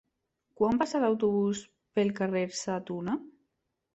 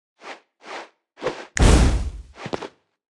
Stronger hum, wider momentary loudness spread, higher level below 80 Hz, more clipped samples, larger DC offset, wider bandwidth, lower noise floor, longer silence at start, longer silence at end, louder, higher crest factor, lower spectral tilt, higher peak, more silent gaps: neither; second, 8 LU vs 24 LU; second, -66 dBFS vs -24 dBFS; neither; neither; second, 8.2 kHz vs 12 kHz; first, -81 dBFS vs -42 dBFS; first, 0.6 s vs 0.25 s; first, 0.65 s vs 0.5 s; second, -30 LUFS vs -22 LUFS; about the same, 18 dB vs 20 dB; about the same, -5.5 dB/octave vs -5 dB/octave; second, -12 dBFS vs -2 dBFS; neither